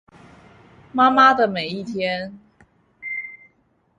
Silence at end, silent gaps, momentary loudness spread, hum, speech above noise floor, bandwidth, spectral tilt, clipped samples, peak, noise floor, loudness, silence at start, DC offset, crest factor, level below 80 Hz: 0.65 s; none; 21 LU; none; 45 dB; 9.8 kHz; -5.5 dB/octave; under 0.1%; -2 dBFS; -63 dBFS; -19 LUFS; 0.95 s; under 0.1%; 20 dB; -62 dBFS